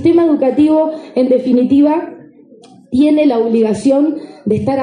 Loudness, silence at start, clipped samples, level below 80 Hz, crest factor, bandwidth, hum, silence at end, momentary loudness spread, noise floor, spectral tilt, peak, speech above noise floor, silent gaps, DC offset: -13 LUFS; 0 s; under 0.1%; -54 dBFS; 12 dB; 10 kHz; none; 0 s; 8 LU; -41 dBFS; -7.5 dB/octave; -2 dBFS; 30 dB; none; under 0.1%